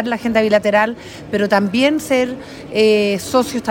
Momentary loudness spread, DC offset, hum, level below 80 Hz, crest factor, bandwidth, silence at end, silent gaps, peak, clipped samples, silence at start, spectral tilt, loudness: 9 LU; under 0.1%; none; -50 dBFS; 14 dB; 17 kHz; 0 s; none; -2 dBFS; under 0.1%; 0 s; -4.5 dB/octave; -16 LUFS